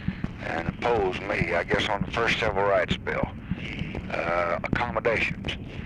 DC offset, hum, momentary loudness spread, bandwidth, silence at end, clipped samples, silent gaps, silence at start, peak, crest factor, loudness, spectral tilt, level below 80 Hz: under 0.1%; none; 9 LU; 11.5 kHz; 0 s; under 0.1%; none; 0 s; -10 dBFS; 18 dB; -27 LUFS; -6 dB/octave; -42 dBFS